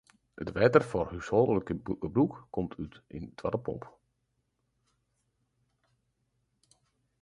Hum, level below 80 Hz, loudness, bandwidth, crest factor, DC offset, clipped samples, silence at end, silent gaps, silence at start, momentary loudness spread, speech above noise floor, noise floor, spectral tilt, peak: none; -56 dBFS; -30 LUFS; 11 kHz; 24 dB; under 0.1%; under 0.1%; 3.35 s; none; 0.35 s; 18 LU; 49 dB; -79 dBFS; -8 dB/octave; -8 dBFS